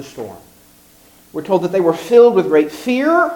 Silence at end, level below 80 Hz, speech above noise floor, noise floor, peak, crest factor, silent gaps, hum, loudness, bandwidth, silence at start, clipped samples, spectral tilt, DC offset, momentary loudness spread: 0 s; -58 dBFS; 33 dB; -48 dBFS; 0 dBFS; 16 dB; none; none; -14 LUFS; 18 kHz; 0 s; under 0.1%; -6 dB/octave; under 0.1%; 20 LU